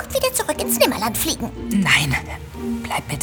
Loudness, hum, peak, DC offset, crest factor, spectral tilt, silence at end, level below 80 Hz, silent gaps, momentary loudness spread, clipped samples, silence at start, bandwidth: -20 LUFS; none; -2 dBFS; under 0.1%; 20 dB; -3.5 dB/octave; 0 s; -38 dBFS; none; 12 LU; under 0.1%; 0 s; over 20 kHz